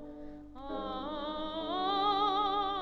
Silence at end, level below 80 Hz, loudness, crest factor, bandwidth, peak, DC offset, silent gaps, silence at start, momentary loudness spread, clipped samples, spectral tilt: 0 s; -54 dBFS; -33 LUFS; 16 dB; 7.4 kHz; -18 dBFS; under 0.1%; none; 0 s; 18 LU; under 0.1%; -5.5 dB/octave